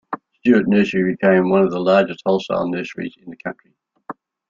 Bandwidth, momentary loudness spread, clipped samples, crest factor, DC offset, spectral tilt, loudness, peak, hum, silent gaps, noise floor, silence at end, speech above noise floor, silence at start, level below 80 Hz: 7.4 kHz; 17 LU; under 0.1%; 16 dB; under 0.1%; -7.5 dB/octave; -17 LUFS; -2 dBFS; none; none; -38 dBFS; 0.35 s; 20 dB; 0.1 s; -58 dBFS